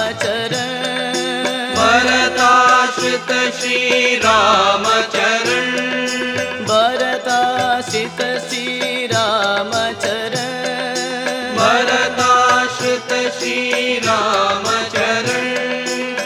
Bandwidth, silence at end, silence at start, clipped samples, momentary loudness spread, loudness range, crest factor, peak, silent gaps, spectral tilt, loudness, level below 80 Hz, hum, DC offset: 17 kHz; 0 s; 0 s; under 0.1%; 8 LU; 5 LU; 16 dB; 0 dBFS; none; -2.5 dB/octave; -15 LUFS; -56 dBFS; none; under 0.1%